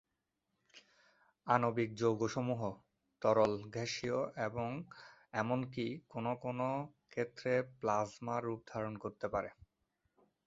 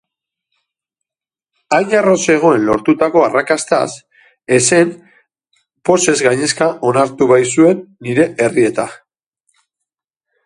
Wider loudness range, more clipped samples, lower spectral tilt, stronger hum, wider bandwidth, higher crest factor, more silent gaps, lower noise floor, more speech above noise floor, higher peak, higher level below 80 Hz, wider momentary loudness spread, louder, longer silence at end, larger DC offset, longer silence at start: about the same, 4 LU vs 2 LU; neither; first, -5.5 dB/octave vs -4 dB/octave; neither; second, 7.6 kHz vs 11.5 kHz; first, 24 dB vs 14 dB; neither; about the same, -87 dBFS vs -90 dBFS; second, 50 dB vs 77 dB; second, -14 dBFS vs 0 dBFS; second, -70 dBFS vs -56 dBFS; first, 10 LU vs 7 LU; second, -38 LUFS vs -13 LUFS; second, 0.95 s vs 1.5 s; neither; second, 0.75 s vs 1.7 s